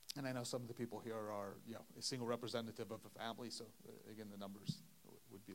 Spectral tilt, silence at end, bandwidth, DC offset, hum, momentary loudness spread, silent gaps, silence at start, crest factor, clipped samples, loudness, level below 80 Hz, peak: -4.5 dB/octave; 0 s; 16 kHz; under 0.1%; none; 14 LU; none; 0 s; 22 dB; under 0.1%; -48 LUFS; -86 dBFS; -26 dBFS